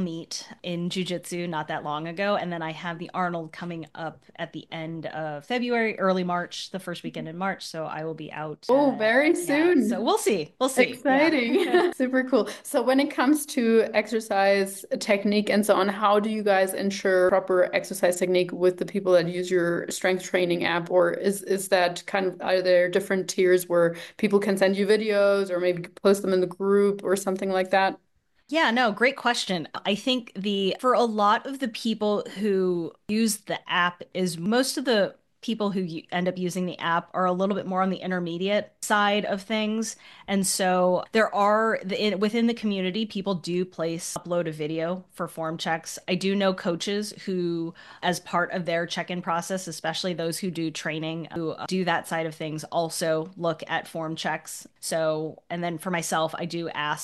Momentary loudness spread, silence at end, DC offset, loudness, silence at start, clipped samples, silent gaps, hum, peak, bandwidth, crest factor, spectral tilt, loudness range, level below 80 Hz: 11 LU; 0 s; under 0.1%; -25 LUFS; 0 s; under 0.1%; none; none; -8 dBFS; 12.5 kHz; 18 dB; -4.5 dB/octave; 6 LU; -70 dBFS